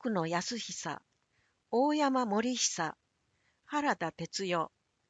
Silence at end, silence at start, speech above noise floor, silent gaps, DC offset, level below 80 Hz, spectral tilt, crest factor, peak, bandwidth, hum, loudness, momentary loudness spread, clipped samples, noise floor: 0.4 s; 0 s; 43 dB; none; under 0.1%; -76 dBFS; -3.5 dB/octave; 18 dB; -16 dBFS; 9.2 kHz; none; -33 LUFS; 9 LU; under 0.1%; -75 dBFS